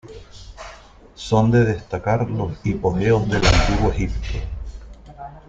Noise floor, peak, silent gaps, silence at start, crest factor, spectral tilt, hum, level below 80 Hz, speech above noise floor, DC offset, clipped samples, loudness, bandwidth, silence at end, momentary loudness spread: -44 dBFS; -2 dBFS; none; 0.05 s; 18 dB; -6 dB/octave; none; -28 dBFS; 25 dB; under 0.1%; under 0.1%; -20 LUFS; 8.8 kHz; 0.1 s; 22 LU